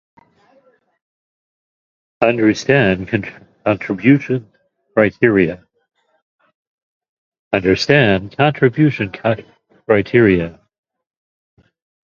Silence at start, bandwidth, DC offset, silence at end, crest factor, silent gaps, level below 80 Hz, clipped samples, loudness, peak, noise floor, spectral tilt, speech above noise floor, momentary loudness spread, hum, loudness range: 2.2 s; 7.4 kHz; under 0.1%; 1.55 s; 18 dB; 6.22-6.39 s, 6.54-7.01 s, 7.09-7.32 s, 7.39-7.51 s; -46 dBFS; under 0.1%; -15 LUFS; 0 dBFS; -56 dBFS; -7 dB/octave; 41 dB; 10 LU; none; 4 LU